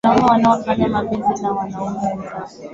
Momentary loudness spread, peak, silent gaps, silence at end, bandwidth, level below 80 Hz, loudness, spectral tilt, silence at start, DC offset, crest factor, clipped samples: 14 LU; -2 dBFS; none; 0 s; 7.8 kHz; -46 dBFS; -18 LUFS; -6.5 dB/octave; 0.05 s; under 0.1%; 16 dB; under 0.1%